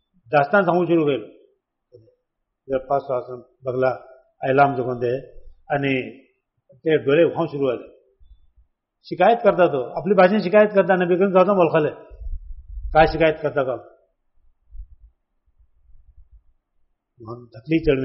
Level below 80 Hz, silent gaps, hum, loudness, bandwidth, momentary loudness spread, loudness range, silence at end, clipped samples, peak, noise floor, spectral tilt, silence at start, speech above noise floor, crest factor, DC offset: -42 dBFS; none; none; -20 LUFS; 5.8 kHz; 21 LU; 9 LU; 0 s; under 0.1%; -2 dBFS; -77 dBFS; -5 dB/octave; 0.3 s; 58 dB; 18 dB; under 0.1%